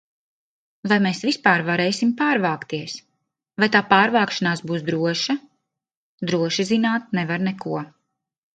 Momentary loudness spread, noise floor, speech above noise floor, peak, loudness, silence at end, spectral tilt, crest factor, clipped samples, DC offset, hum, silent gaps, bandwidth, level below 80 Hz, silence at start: 13 LU; -81 dBFS; 61 dB; 0 dBFS; -21 LUFS; 0.65 s; -5 dB/octave; 22 dB; under 0.1%; under 0.1%; none; 5.97-6.18 s; 9.2 kHz; -68 dBFS; 0.85 s